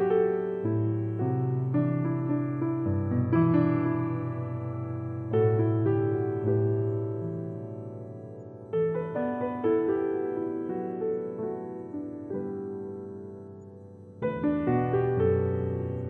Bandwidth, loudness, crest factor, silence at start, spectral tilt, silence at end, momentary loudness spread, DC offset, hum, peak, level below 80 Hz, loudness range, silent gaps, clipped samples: 3.8 kHz; -29 LUFS; 16 dB; 0 s; -12 dB/octave; 0 s; 14 LU; under 0.1%; none; -12 dBFS; -64 dBFS; 7 LU; none; under 0.1%